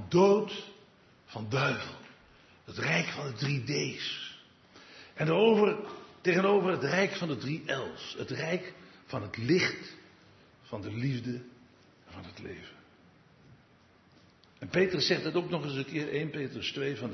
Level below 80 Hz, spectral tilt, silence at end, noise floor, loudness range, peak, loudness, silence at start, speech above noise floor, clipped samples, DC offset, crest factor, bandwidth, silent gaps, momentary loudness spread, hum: -72 dBFS; -5.5 dB/octave; 0 s; -62 dBFS; 12 LU; -12 dBFS; -30 LUFS; 0 s; 32 dB; under 0.1%; under 0.1%; 20 dB; 6.4 kHz; none; 21 LU; none